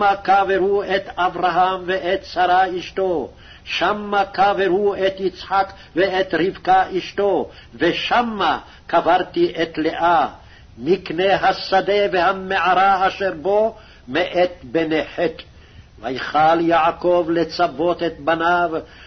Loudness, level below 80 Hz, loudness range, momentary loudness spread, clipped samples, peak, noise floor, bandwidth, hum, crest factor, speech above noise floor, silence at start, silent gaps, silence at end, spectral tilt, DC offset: -19 LUFS; -48 dBFS; 2 LU; 7 LU; under 0.1%; -6 dBFS; -44 dBFS; 6.4 kHz; none; 14 dB; 25 dB; 0 s; none; 0.05 s; -5.5 dB/octave; under 0.1%